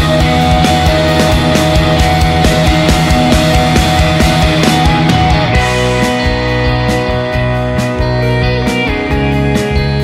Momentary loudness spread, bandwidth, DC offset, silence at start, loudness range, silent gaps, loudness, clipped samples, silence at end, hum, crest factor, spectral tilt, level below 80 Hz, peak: 4 LU; 16 kHz; under 0.1%; 0 s; 3 LU; none; -11 LUFS; under 0.1%; 0 s; none; 10 dB; -5.5 dB/octave; -18 dBFS; 0 dBFS